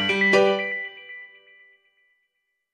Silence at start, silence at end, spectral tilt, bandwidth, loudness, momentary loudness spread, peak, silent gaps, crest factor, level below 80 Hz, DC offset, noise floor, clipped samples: 0 s; 1.5 s; -4.5 dB/octave; 11 kHz; -20 LUFS; 22 LU; -6 dBFS; none; 20 dB; -74 dBFS; under 0.1%; -76 dBFS; under 0.1%